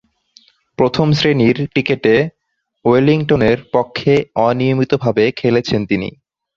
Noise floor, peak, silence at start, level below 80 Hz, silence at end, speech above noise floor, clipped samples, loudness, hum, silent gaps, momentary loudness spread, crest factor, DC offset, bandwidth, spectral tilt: -51 dBFS; 0 dBFS; 0.8 s; -46 dBFS; 0.45 s; 37 dB; under 0.1%; -15 LUFS; none; none; 5 LU; 14 dB; under 0.1%; 7.4 kHz; -7 dB/octave